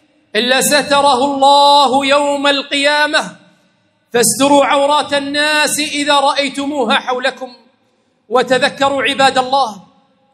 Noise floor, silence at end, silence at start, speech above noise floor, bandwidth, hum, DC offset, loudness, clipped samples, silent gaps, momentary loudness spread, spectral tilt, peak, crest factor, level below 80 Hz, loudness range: -59 dBFS; 0.55 s; 0.35 s; 46 dB; 16 kHz; none; under 0.1%; -12 LUFS; under 0.1%; none; 8 LU; -2 dB/octave; 0 dBFS; 14 dB; -60 dBFS; 4 LU